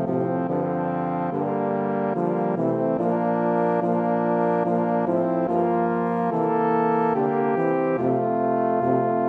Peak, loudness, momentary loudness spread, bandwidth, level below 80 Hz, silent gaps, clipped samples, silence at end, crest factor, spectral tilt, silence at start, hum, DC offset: -10 dBFS; -23 LUFS; 3 LU; 4.7 kHz; -68 dBFS; none; under 0.1%; 0 s; 14 dB; -10.5 dB/octave; 0 s; none; under 0.1%